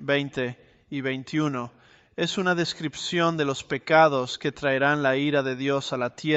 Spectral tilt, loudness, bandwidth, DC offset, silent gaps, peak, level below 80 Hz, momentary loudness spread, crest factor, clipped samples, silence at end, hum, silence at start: -5 dB/octave; -25 LUFS; 8.2 kHz; under 0.1%; none; -6 dBFS; -64 dBFS; 10 LU; 20 dB; under 0.1%; 0 s; none; 0 s